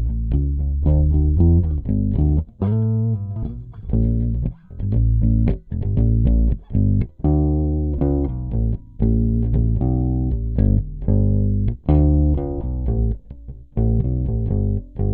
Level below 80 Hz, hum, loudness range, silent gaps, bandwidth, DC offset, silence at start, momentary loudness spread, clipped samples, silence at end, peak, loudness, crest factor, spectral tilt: -22 dBFS; none; 2 LU; none; 2.6 kHz; under 0.1%; 0 s; 8 LU; under 0.1%; 0 s; -4 dBFS; -20 LUFS; 14 dB; -14.5 dB/octave